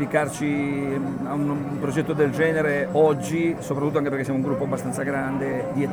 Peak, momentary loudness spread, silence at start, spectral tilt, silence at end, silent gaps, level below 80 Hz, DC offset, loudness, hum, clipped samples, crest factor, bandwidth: -6 dBFS; 6 LU; 0 s; -6.5 dB/octave; 0 s; none; -54 dBFS; under 0.1%; -24 LUFS; none; under 0.1%; 16 dB; 19.5 kHz